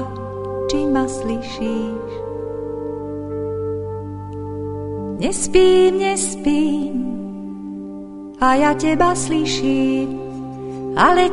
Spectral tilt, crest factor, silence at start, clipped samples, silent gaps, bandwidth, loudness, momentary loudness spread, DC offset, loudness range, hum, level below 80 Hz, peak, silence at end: -4.5 dB/octave; 18 dB; 0 s; under 0.1%; none; 11 kHz; -20 LUFS; 15 LU; under 0.1%; 8 LU; none; -40 dBFS; -2 dBFS; 0 s